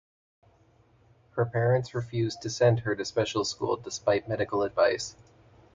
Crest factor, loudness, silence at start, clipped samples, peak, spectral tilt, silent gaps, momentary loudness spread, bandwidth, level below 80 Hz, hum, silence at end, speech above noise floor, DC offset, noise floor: 18 dB; -28 LUFS; 1.35 s; under 0.1%; -12 dBFS; -5.5 dB/octave; none; 7 LU; 9.2 kHz; -60 dBFS; none; 0.65 s; 35 dB; under 0.1%; -62 dBFS